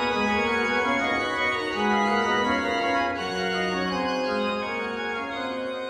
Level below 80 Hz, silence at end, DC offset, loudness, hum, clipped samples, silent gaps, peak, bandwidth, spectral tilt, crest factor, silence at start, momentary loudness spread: -54 dBFS; 0 s; under 0.1%; -25 LUFS; none; under 0.1%; none; -10 dBFS; 12.5 kHz; -4.5 dB/octave; 14 dB; 0 s; 6 LU